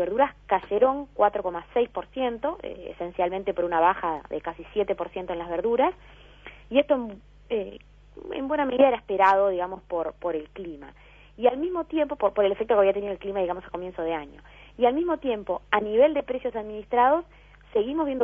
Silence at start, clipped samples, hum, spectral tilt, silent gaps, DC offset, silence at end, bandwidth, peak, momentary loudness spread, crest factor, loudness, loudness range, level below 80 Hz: 0 s; under 0.1%; 50 Hz at -55 dBFS; -7 dB/octave; none; under 0.1%; 0 s; 5.4 kHz; -4 dBFS; 13 LU; 20 dB; -26 LUFS; 3 LU; -54 dBFS